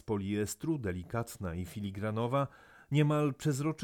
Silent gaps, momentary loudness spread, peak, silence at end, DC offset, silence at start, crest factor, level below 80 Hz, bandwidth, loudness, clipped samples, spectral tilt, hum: none; 10 LU; -16 dBFS; 0 s; under 0.1%; 0.05 s; 18 dB; -60 dBFS; 17.5 kHz; -34 LUFS; under 0.1%; -6.5 dB/octave; none